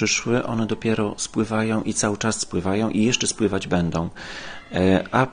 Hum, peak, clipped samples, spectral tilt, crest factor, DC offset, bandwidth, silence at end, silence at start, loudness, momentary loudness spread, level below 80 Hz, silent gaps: none; -2 dBFS; under 0.1%; -4.5 dB/octave; 20 dB; under 0.1%; 10 kHz; 0 s; 0 s; -22 LUFS; 8 LU; -48 dBFS; none